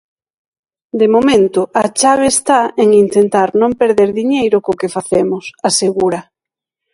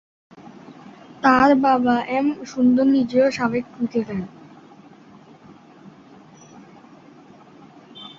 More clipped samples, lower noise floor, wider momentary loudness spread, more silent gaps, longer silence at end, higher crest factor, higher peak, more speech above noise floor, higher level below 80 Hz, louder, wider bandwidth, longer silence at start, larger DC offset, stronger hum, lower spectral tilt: neither; first, -86 dBFS vs -47 dBFS; second, 8 LU vs 13 LU; neither; first, 0.7 s vs 0.1 s; second, 14 dB vs 20 dB; about the same, 0 dBFS vs -2 dBFS; first, 74 dB vs 29 dB; first, -50 dBFS vs -58 dBFS; first, -12 LUFS vs -19 LUFS; first, 11.5 kHz vs 7.4 kHz; first, 0.95 s vs 0.4 s; neither; neither; second, -4 dB/octave vs -6 dB/octave